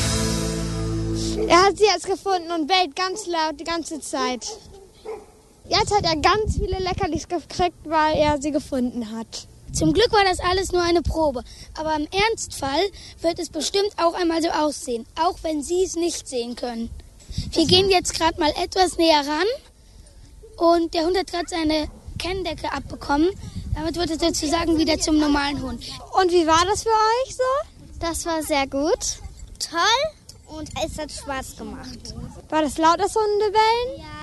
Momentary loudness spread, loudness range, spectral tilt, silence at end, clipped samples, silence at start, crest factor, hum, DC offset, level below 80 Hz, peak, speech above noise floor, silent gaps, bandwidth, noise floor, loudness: 14 LU; 5 LU; -4 dB/octave; 0 s; under 0.1%; 0 s; 20 dB; none; under 0.1%; -38 dBFS; -2 dBFS; 26 dB; none; 12.5 kHz; -47 dBFS; -22 LUFS